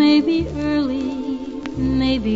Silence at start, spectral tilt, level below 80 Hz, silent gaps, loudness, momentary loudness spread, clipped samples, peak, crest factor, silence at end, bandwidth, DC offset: 0 s; -7 dB/octave; -36 dBFS; none; -21 LUFS; 10 LU; under 0.1%; -4 dBFS; 14 dB; 0 s; 7.8 kHz; 0.1%